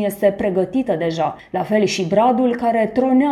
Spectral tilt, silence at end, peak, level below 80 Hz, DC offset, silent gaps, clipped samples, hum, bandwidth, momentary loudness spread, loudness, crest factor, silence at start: -6 dB/octave; 0 s; -4 dBFS; -52 dBFS; under 0.1%; none; under 0.1%; none; 13.5 kHz; 5 LU; -18 LUFS; 14 dB; 0 s